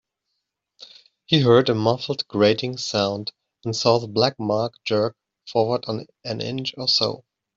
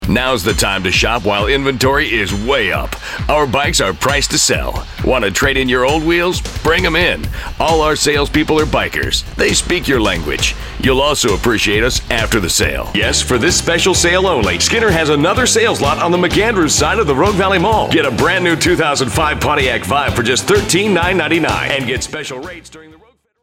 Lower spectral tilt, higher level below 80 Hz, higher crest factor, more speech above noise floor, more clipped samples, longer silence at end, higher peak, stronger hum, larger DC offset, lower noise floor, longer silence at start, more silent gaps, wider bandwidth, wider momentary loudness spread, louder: first, -5.5 dB/octave vs -3.5 dB/octave; second, -62 dBFS vs -28 dBFS; first, 20 dB vs 14 dB; first, 57 dB vs 34 dB; neither; second, 0.4 s vs 0.6 s; second, -4 dBFS vs 0 dBFS; neither; neither; first, -79 dBFS vs -48 dBFS; first, 0.8 s vs 0 s; neither; second, 7.8 kHz vs 16.5 kHz; first, 14 LU vs 5 LU; second, -22 LUFS vs -13 LUFS